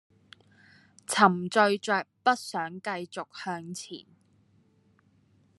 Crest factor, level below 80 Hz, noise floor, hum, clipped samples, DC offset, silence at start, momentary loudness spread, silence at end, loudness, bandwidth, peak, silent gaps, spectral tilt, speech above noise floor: 26 dB; -82 dBFS; -65 dBFS; none; under 0.1%; under 0.1%; 1.1 s; 17 LU; 1.6 s; -28 LUFS; 13 kHz; -4 dBFS; none; -4 dB/octave; 37 dB